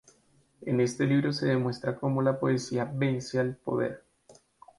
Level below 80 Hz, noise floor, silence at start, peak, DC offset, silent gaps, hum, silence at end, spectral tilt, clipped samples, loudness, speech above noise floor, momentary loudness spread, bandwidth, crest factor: -66 dBFS; -65 dBFS; 0.6 s; -12 dBFS; under 0.1%; none; none; 0.45 s; -6.5 dB/octave; under 0.1%; -29 LUFS; 37 dB; 6 LU; 11.5 kHz; 18 dB